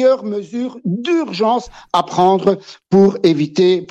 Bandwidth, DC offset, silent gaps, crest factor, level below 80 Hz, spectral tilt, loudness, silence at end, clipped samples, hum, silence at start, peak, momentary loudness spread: 8.4 kHz; under 0.1%; none; 12 dB; -52 dBFS; -6.5 dB/octave; -16 LUFS; 0.05 s; under 0.1%; none; 0 s; -2 dBFS; 10 LU